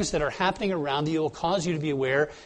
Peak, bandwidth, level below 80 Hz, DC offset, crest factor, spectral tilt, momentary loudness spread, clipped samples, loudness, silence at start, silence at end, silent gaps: -10 dBFS; 10.5 kHz; -50 dBFS; under 0.1%; 18 dB; -5 dB/octave; 2 LU; under 0.1%; -27 LUFS; 0 s; 0 s; none